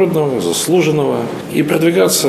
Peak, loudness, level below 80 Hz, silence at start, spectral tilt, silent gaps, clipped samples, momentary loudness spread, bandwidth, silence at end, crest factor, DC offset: 0 dBFS; -14 LUFS; -56 dBFS; 0 s; -4.5 dB/octave; none; under 0.1%; 6 LU; 14.5 kHz; 0 s; 14 dB; under 0.1%